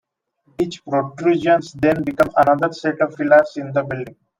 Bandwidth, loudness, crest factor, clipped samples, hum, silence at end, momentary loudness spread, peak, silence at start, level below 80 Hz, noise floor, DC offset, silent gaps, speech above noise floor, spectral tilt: 15 kHz; -18 LUFS; 18 dB; under 0.1%; none; 0.3 s; 10 LU; 0 dBFS; 0.6 s; -52 dBFS; -62 dBFS; under 0.1%; none; 44 dB; -7 dB/octave